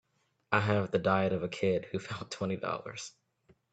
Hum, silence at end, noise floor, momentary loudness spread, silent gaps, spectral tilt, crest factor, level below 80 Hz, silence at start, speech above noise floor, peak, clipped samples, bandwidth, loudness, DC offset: none; 0.65 s; -68 dBFS; 12 LU; none; -6 dB/octave; 24 dB; -68 dBFS; 0.5 s; 36 dB; -10 dBFS; under 0.1%; 9 kHz; -32 LUFS; under 0.1%